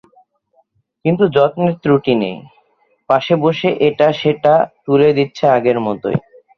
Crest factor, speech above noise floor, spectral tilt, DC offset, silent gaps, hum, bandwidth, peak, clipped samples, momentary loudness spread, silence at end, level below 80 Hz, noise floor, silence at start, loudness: 14 dB; 46 dB; -8 dB/octave; under 0.1%; none; none; 6.6 kHz; 0 dBFS; under 0.1%; 8 LU; 0.4 s; -54 dBFS; -59 dBFS; 1.05 s; -15 LUFS